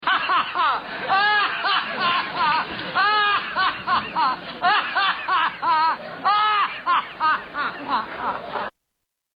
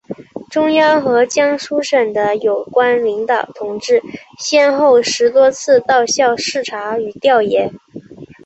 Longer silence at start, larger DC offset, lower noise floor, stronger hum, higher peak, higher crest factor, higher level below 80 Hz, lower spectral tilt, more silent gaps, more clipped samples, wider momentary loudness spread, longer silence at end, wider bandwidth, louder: about the same, 0 s vs 0.1 s; neither; first, -79 dBFS vs -34 dBFS; neither; second, -10 dBFS vs -2 dBFS; about the same, 12 dB vs 12 dB; about the same, -60 dBFS vs -60 dBFS; first, -4.5 dB/octave vs -3 dB/octave; neither; neither; about the same, 8 LU vs 10 LU; first, 0.65 s vs 0.2 s; second, 5.4 kHz vs 8.2 kHz; second, -21 LUFS vs -14 LUFS